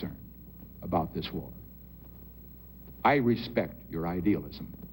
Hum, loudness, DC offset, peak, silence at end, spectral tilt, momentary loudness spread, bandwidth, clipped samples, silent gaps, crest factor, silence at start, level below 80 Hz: none; -31 LUFS; under 0.1%; -12 dBFS; 0 s; -8.5 dB/octave; 22 LU; 16.5 kHz; under 0.1%; none; 22 dB; 0 s; -52 dBFS